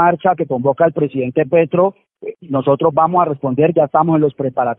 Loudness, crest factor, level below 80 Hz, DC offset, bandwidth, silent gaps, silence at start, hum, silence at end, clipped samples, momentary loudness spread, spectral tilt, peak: -15 LUFS; 14 dB; -58 dBFS; under 0.1%; 3.9 kHz; none; 0 s; none; 0.05 s; under 0.1%; 6 LU; -12.5 dB/octave; 0 dBFS